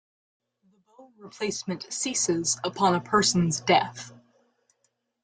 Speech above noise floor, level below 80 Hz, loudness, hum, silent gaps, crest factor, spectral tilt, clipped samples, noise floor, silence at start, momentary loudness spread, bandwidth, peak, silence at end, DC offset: 49 dB; -64 dBFS; -25 LUFS; none; none; 22 dB; -3.5 dB/octave; under 0.1%; -75 dBFS; 1 s; 11 LU; 9.6 kHz; -6 dBFS; 1.1 s; under 0.1%